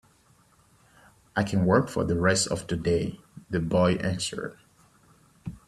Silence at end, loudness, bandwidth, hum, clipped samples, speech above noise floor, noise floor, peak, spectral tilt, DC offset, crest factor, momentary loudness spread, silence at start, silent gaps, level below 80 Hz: 0.1 s; -26 LUFS; 13 kHz; none; under 0.1%; 36 dB; -61 dBFS; -6 dBFS; -5 dB/octave; under 0.1%; 22 dB; 15 LU; 1.35 s; none; -52 dBFS